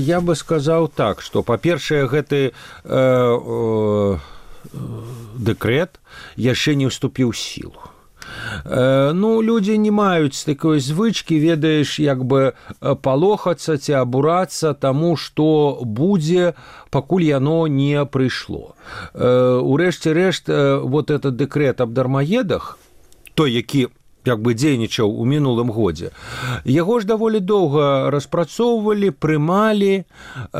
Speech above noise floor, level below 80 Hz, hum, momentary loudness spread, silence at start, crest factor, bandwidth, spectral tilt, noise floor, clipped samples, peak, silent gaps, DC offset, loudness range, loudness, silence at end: 28 dB; -48 dBFS; none; 11 LU; 0 s; 14 dB; 15.5 kHz; -6.5 dB/octave; -46 dBFS; under 0.1%; -4 dBFS; none; under 0.1%; 4 LU; -18 LUFS; 0 s